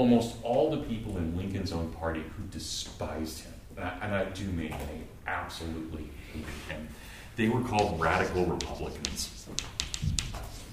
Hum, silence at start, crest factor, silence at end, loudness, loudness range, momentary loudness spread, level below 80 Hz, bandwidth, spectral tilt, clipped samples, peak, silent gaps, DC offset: none; 0 s; 28 dB; 0 s; -33 LUFS; 6 LU; 13 LU; -44 dBFS; 15.5 kHz; -5 dB/octave; under 0.1%; -4 dBFS; none; under 0.1%